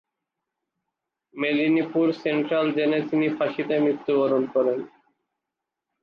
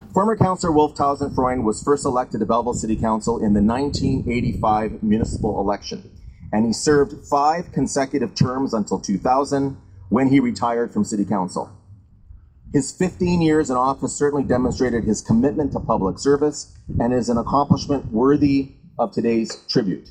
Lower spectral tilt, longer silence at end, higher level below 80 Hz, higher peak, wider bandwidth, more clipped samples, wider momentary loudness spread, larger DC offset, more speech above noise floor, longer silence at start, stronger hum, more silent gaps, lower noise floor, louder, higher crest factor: first, -8 dB/octave vs -6 dB/octave; first, 1.15 s vs 0.1 s; second, -76 dBFS vs -40 dBFS; second, -10 dBFS vs -2 dBFS; second, 5.8 kHz vs 10 kHz; neither; about the same, 4 LU vs 6 LU; neither; first, 63 dB vs 27 dB; first, 1.35 s vs 0 s; neither; neither; first, -85 dBFS vs -47 dBFS; second, -23 LUFS vs -20 LUFS; about the same, 14 dB vs 18 dB